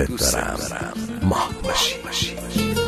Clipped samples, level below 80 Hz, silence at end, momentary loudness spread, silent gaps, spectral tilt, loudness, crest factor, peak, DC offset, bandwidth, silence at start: under 0.1%; -36 dBFS; 0 s; 7 LU; none; -3.5 dB/octave; -22 LUFS; 16 dB; -6 dBFS; under 0.1%; 13.5 kHz; 0 s